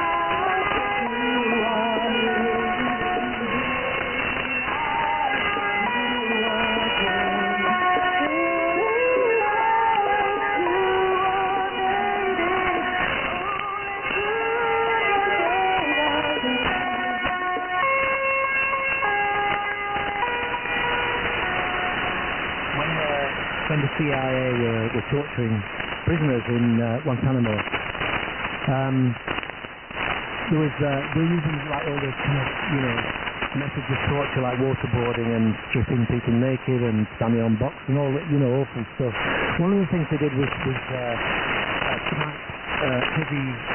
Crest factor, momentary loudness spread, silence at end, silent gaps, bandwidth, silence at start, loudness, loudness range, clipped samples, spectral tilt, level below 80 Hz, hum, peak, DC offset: 14 dB; 5 LU; 0 s; none; 3.3 kHz; 0 s; -23 LUFS; 4 LU; under 0.1%; -2 dB/octave; -46 dBFS; none; -10 dBFS; under 0.1%